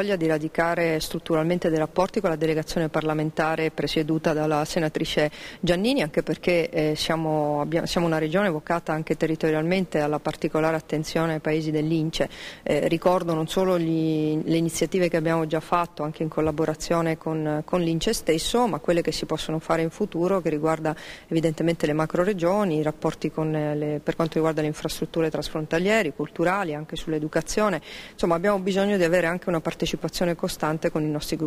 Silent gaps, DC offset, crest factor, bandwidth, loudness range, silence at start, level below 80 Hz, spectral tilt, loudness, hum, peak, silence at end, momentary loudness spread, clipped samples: none; under 0.1%; 16 dB; 16 kHz; 1 LU; 0 s; -48 dBFS; -5.5 dB/octave; -25 LUFS; none; -8 dBFS; 0 s; 5 LU; under 0.1%